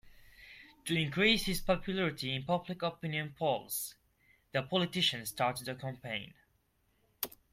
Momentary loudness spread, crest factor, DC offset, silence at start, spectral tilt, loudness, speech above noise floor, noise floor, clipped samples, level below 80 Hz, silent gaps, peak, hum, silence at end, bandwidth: 13 LU; 22 dB; under 0.1%; 0.05 s; -4 dB/octave; -34 LUFS; 40 dB; -74 dBFS; under 0.1%; -56 dBFS; none; -14 dBFS; none; 0.25 s; 16.5 kHz